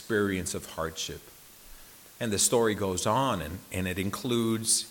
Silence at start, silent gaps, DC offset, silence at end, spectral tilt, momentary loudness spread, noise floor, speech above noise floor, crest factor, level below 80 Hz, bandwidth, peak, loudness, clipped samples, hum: 0 s; none; under 0.1%; 0 s; -3.5 dB/octave; 23 LU; -50 dBFS; 21 dB; 20 dB; -58 dBFS; 17.5 kHz; -10 dBFS; -29 LUFS; under 0.1%; none